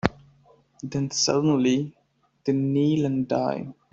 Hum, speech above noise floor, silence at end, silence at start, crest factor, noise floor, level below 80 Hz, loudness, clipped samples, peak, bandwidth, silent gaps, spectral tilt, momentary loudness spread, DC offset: none; 35 dB; 0.2 s; 0.05 s; 24 dB; -58 dBFS; -54 dBFS; -24 LUFS; under 0.1%; 0 dBFS; 8 kHz; none; -5 dB/octave; 11 LU; under 0.1%